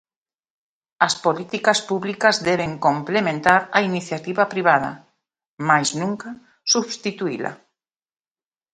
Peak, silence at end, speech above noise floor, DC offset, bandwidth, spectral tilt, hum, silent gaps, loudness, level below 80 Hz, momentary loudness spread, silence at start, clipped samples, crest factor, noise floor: 0 dBFS; 1.2 s; over 70 dB; under 0.1%; 11.5 kHz; -3.5 dB/octave; none; 5.47-5.57 s; -20 LUFS; -60 dBFS; 10 LU; 1 s; under 0.1%; 22 dB; under -90 dBFS